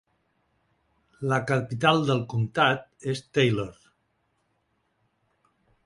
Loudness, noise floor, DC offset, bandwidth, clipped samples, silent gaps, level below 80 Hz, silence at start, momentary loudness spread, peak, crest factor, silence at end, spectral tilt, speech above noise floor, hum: -25 LUFS; -73 dBFS; under 0.1%; 11.5 kHz; under 0.1%; none; -62 dBFS; 1.2 s; 10 LU; -6 dBFS; 22 dB; 2.15 s; -6 dB/octave; 48 dB; none